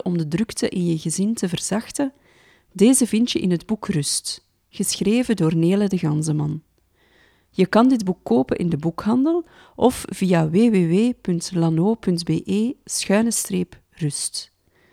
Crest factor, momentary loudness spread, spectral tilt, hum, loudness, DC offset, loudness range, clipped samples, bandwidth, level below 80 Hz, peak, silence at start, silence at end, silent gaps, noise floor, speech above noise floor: 18 dB; 10 LU; -5.5 dB/octave; none; -21 LUFS; under 0.1%; 2 LU; under 0.1%; 16 kHz; -54 dBFS; -2 dBFS; 0.05 s; 0.45 s; none; -60 dBFS; 40 dB